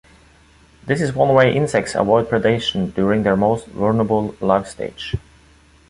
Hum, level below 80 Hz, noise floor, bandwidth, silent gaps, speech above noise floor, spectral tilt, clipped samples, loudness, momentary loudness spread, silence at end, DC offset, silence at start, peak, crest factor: none; -44 dBFS; -50 dBFS; 11.5 kHz; none; 33 dB; -6 dB/octave; under 0.1%; -18 LUFS; 13 LU; 0.7 s; under 0.1%; 0.85 s; 0 dBFS; 18 dB